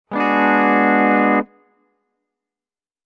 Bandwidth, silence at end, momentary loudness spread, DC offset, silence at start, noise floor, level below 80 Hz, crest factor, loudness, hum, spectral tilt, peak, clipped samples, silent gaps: 6.2 kHz; 1.65 s; 6 LU; under 0.1%; 0.1 s; under -90 dBFS; -68 dBFS; 14 dB; -15 LUFS; none; -8 dB/octave; -4 dBFS; under 0.1%; none